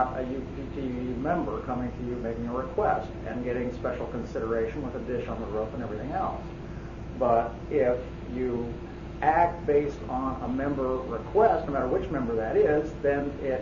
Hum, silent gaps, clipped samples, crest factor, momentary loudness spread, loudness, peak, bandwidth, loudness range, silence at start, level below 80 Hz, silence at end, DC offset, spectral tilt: none; none; under 0.1%; 20 dB; 11 LU; -29 LUFS; -8 dBFS; 7.4 kHz; 5 LU; 0 s; -42 dBFS; 0 s; under 0.1%; -8.5 dB/octave